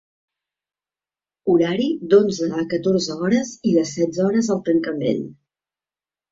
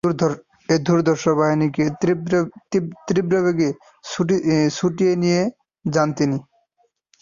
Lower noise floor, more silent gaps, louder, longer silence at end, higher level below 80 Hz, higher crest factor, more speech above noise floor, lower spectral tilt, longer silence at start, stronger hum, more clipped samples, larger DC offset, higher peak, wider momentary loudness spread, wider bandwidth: first, under -90 dBFS vs -66 dBFS; neither; about the same, -20 LUFS vs -20 LUFS; first, 1 s vs 0.8 s; about the same, -62 dBFS vs -58 dBFS; about the same, 18 dB vs 16 dB; first, over 71 dB vs 47 dB; about the same, -6 dB/octave vs -6.5 dB/octave; first, 1.45 s vs 0.05 s; neither; neither; neither; about the same, -2 dBFS vs -4 dBFS; about the same, 7 LU vs 7 LU; about the same, 7.8 kHz vs 7.4 kHz